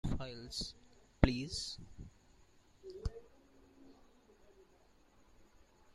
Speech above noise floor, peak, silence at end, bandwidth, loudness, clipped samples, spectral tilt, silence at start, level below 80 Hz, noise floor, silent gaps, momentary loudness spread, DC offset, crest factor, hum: 24 dB; -6 dBFS; 0.05 s; 13 kHz; -40 LUFS; under 0.1%; -5.5 dB/octave; 0.05 s; -48 dBFS; -67 dBFS; none; 29 LU; under 0.1%; 36 dB; none